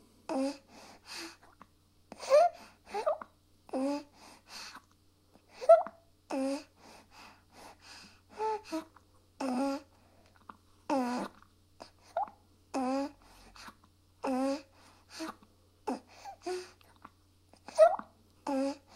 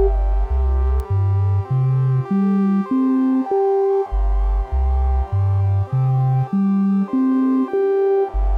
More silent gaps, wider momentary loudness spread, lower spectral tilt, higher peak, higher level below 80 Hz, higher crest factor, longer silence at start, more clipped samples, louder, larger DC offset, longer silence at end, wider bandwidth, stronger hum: neither; first, 28 LU vs 4 LU; second, -4 dB/octave vs -11.5 dB/octave; second, -10 dBFS vs -6 dBFS; second, -72 dBFS vs -22 dBFS; first, 24 dB vs 10 dB; first, 0.3 s vs 0 s; neither; second, -33 LUFS vs -19 LUFS; neither; first, 0.2 s vs 0 s; first, 13.5 kHz vs 5 kHz; neither